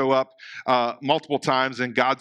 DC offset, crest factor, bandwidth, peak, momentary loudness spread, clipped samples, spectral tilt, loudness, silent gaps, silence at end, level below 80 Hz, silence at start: under 0.1%; 20 dB; 11.5 kHz; -4 dBFS; 4 LU; under 0.1%; -5 dB/octave; -23 LUFS; none; 0.05 s; -80 dBFS; 0 s